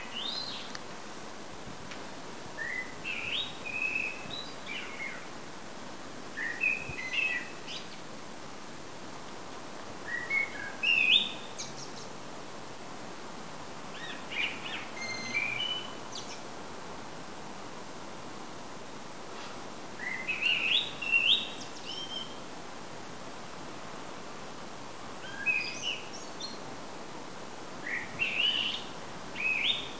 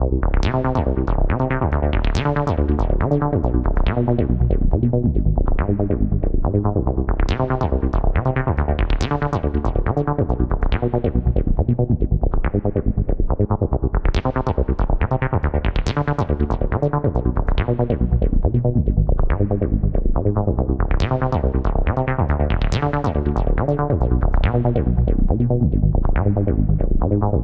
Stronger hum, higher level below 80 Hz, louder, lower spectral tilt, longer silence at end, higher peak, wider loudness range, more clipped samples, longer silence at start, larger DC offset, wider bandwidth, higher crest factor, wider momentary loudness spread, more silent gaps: neither; second, -66 dBFS vs -20 dBFS; second, -32 LUFS vs -20 LUFS; second, -2 dB/octave vs -9 dB/octave; about the same, 0 s vs 0 s; second, -12 dBFS vs -4 dBFS; first, 12 LU vs 2 LU; neither; about the same, 0 s vs 0 s; first, 0.6% vs under 0.1%; first, 8 kHz vs 7.2 kHz; first, 24 dB vs 14 dB; first, 17 LU vs 2 LU; neither